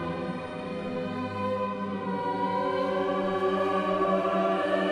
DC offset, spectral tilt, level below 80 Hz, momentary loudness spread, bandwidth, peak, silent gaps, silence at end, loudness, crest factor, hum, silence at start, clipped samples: under 0.1%; -7 dB/octave; -62 dBFS; 8 LU; 11.5 kHz; -12 dBFS; none; 0 s; -29 LUFS; 16 dB; none; 0 s; under 0.1%